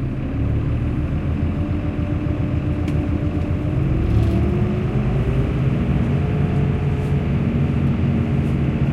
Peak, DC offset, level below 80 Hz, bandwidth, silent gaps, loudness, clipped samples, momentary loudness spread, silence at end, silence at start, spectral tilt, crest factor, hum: -4 dBFS; under 0.1%; -28 dBFS; 6.8 kHz; none; -21 LUFS; under 0.1%; 3 LU; 0 s; 0 s; -9.5 dB/octave; 14 dB; none